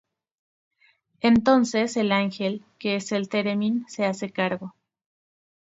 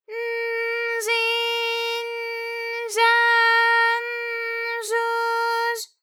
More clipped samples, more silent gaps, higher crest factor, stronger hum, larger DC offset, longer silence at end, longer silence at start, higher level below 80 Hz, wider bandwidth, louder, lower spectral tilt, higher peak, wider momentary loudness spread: neither; neither; about the same, 20 dB vs 16 dB; neither; neither; first, 0.9 s vs 0.15 s; first, 1.25 s vs 0.1 s; first, -62 dBFS vs under -90 dBFS; second, 8 kHz vs 19 kHz; second, -24 LUFS vs -21 LUFS; first, -5 dB/octave vs 5 dB/octave; about the same, -6 dBFS vs -8 dBFS; about the same, 10 LU vs 12 LU